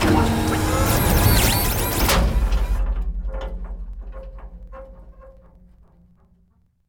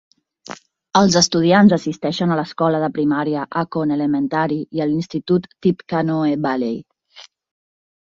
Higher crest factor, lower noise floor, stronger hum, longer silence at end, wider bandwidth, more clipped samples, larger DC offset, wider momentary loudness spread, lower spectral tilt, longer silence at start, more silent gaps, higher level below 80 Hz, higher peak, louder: about the same, 18 dB vs 18 dB; first, -60 dBFS vs -46 dBFS; neither; first, 1.55 s vs 0.9 s; first, over 20 kHz vs 7.8 kHz; neither; neither; first, 24 LU vs 10 LU; about the same, -4.5 dB/octave vs -5 dB/octave; second, 0 s vs 0.5 s; neither; first, -26 dBFS vs -56 dBFS; about the same, -4 dBFS vs -2 dBFS; about the same, -20 LUFS vs -18 LUFS